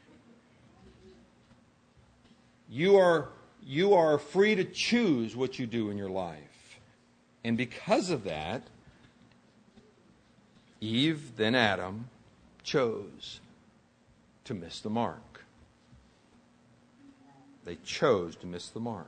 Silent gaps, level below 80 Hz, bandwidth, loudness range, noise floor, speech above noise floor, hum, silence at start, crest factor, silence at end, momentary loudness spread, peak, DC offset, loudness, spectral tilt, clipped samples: none; -66 dBFS; 9.6 kHz; 14 LU; -64 dBFS; 35 dB; none; 1.05 s; 24 dB; 0.05 s; 20 LU; -8 dBFS; under 0.1%; -29 LUFS; -5.5 dB/octave; under 0.1%